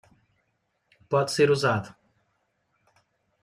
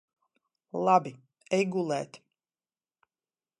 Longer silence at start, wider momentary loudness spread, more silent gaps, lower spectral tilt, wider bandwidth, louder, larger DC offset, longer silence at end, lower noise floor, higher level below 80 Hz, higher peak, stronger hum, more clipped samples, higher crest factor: first, 1.1 s vs 0.75 s; second, 9 LU vs 17 LU; neither; about the same, -5 dB/octave vs -6 dB/octave; first, 14 kHz vs 11.5 kHz; first, -24 LUFS vs -28 LUFS; neither; about the same, 1.55 s vs 1.45 s; second, -75 dBFS vs under -90 dBFS; first, -68 dBFS vs -82 dBFS; about the same, -8 dBFS vs -10 dBFS; neither; neither; about the same, 20 dB vs 22 dB